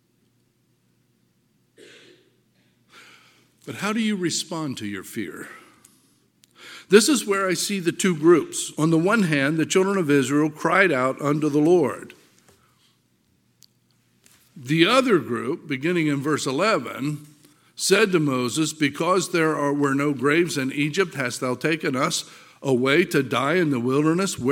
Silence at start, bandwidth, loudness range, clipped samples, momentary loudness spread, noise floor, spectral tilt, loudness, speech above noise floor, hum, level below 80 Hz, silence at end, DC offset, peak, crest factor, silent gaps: 2.95 s; 17 kHz; 9 LU; under 0.1%; 12 LU; -66 dBFS; -4.5 dB/octave; -21 LUFS; 44 dB; none; -70 dBFS; 0 s; under 0.1%; 0 dBFS; 22 dB; none